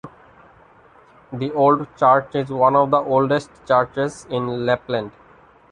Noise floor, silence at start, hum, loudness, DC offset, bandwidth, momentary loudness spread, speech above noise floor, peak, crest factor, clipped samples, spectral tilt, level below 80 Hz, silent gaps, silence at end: -50 dBFS; 0.05 s; none; -19 LUFS; under 0.1%; 10.5 kHz; 10 LU; 31 dB; -2 dBFS; 18 dB; under 0.1%; -6.5 dB/octave; -58 dBFS; none; 0.6 s